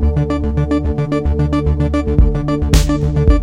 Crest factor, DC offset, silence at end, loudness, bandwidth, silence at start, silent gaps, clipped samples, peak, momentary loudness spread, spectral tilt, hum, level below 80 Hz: 14 dB; under 0.1%; 0 s; -16 LUFS; 16 kHz; 0 s; none; under 0.1%; 0 dBFS; 3 LU; -7 dB/octave; none; -16 dBFS